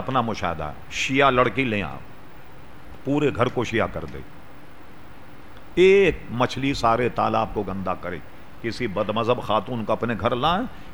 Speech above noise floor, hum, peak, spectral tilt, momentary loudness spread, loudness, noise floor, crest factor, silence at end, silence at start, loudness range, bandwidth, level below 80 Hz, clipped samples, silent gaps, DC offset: 23 dB; none; -4 dBFS; -5.5 dB/octave; 14 LU; -23 LUFS; -46 dBFS; 20 dB; 0 s; 0 s; 6 LU; over 20 kHz; -44 dBFS; under 0.1%; none; 2%